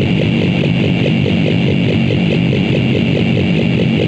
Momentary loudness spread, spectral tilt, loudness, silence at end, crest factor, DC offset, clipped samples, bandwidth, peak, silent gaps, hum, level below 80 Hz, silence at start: 0 LU; -8 dB/octave; -13 LUFS; 0 s; 10 dB; under 0.1%; under 0.1%; 8 kHz; -2 dBFS; none; none; -36 dBFS; 0 s